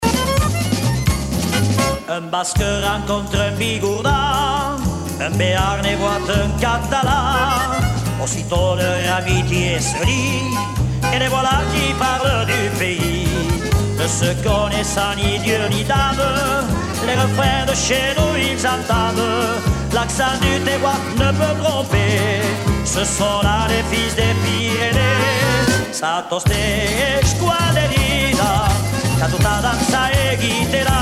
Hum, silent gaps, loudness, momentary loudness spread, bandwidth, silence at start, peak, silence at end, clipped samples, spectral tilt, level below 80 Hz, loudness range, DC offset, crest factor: none; none; -17 LUFS; 4 LU; 16 kHz; 0 s; -2 dBFS; 0 s; under 0.1%; -4.5 dB/octave; -28 dBFS; 2 LU; under 0.1%; 14 dB